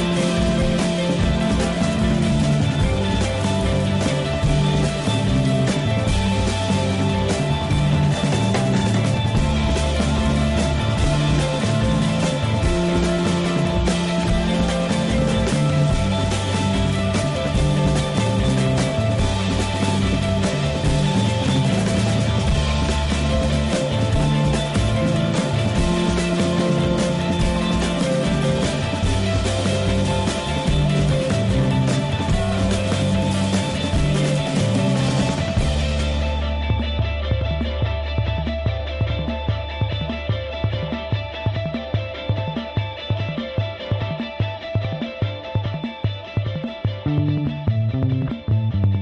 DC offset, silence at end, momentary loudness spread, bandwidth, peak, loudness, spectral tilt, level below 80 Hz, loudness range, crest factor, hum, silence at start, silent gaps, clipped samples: under 0.1%; 0 s; 6 LU; 11.5 kHz; -8 dBFS; -21 LUFS; -6 dB/octave; -30 dBFS; 5 LU; 12 dB; none; 0 s; none; under 0.1%